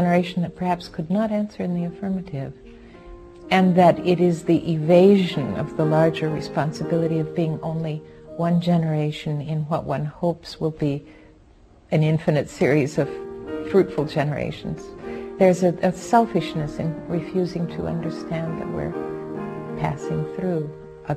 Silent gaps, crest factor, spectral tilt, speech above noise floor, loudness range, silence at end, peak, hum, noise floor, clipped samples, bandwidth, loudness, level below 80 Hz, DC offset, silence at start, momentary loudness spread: none; 18 dB; -7.5 dB/octave; 30 dB; 8 LU; 0 s; -4 dBFS; none; -51 dBFS; under 0.1%; 12 kHz; -22 LUFS; -50 dBFS; under 0.1%; 0 s; 14 LU